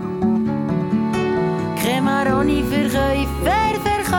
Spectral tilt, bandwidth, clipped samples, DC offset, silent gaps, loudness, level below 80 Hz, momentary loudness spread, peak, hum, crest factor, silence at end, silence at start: -6 dB/octave; 18.5 kHz; under 0.1%; under 0.1%; none; -19 LUFS; -32 dBFS; 3 LU; -6 dBFS; none; 12 dB; 0 s; 0 s